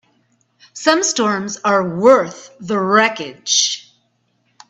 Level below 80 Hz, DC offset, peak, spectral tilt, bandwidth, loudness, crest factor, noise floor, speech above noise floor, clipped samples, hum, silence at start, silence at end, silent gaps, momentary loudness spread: -64 dBFS; under 0.1%; 0 dBFS; -2.5 dB/octave; 8.4 kHz; -15 LUFS; 18 dB; -64 dBFS; 48 dB; under 0.1%; none; 0.75 s; 0.9 s; none; 14 LU